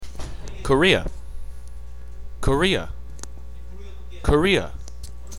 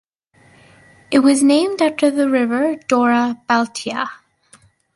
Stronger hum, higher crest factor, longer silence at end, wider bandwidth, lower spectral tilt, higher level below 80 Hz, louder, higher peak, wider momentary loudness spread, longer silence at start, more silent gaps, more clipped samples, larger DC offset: first, 60 Hz at -40 dBFS vs none; first, 22 dB vs 16 dB; second, 0 s vs 0.8 s; first, 15.5 kHz vs 11.5 kHz; first, -5 dB/octave vs -3.5 dB/octave; first, -32 dBFS vs -64 dBFS; second, -21 LUFS vs -17 LUFS; about the same, -2 dBFS vs -2 dBFS; first, 23 LU vs 10 LU; second, 0 s vs 1.1 s; neither; neither; first, 2% vs under 0.1%